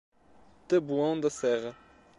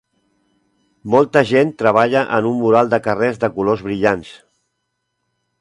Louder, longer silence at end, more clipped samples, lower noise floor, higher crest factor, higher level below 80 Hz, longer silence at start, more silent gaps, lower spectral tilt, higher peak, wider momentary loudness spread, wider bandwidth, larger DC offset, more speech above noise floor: second, -29 LUFS vs -16 LUFS; second, 0.45 s vs 1.25 s; neither; second, -59 dBFS vs -73 dBFS; about the same, 16 dB vs 18 dB; second, -68 dBFS vs -54 dBFS; second, 0.7 s vs 1.05 s; neither; second, -5.5 dB/octave vs -7 dB/octave; second, -14 dBFS vs 0 dBFS; about the same, 5 LU vs 5 LU; about the same, 11 kHz vs 11 kHz; neither; second, 31 dB vs 58 dB